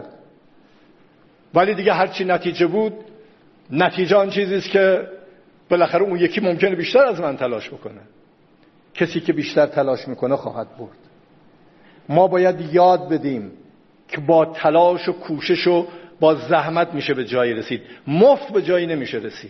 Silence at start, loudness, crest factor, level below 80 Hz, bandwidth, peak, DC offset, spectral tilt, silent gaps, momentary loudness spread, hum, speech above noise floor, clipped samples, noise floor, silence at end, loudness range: 0 s; -19 LUFS; 18 dB; -64 dBFS; 6.4 kHz; -2 dBFS; under 0.1%; -4.5 dB/octave; none; 14 LU; none; 35 dB; under 0.1%; -54 dBFS; 0 s; 5 LU